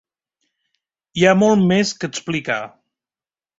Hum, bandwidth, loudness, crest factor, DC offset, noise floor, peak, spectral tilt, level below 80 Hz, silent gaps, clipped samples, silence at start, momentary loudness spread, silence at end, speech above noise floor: none; 8 kHz; -17 LUFS; 18 dB; under 0.1%; under -90 dBFS; -2 dBFS; -5 dB/octave; -58 dBFS; none; under 0.1%; 1.15 s; 13 LU; 0.9 s; over 73 dB